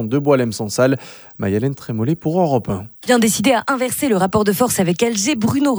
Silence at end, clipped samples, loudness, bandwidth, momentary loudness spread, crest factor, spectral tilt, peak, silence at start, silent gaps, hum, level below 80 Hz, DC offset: 0 s; under 0.1%; -17 LUFS; over 20 kHz; 7 LU; 16 dB; -5 dB/octave; -2 dBFS; 0 s; none; none; -50 dBFS; under 0.1%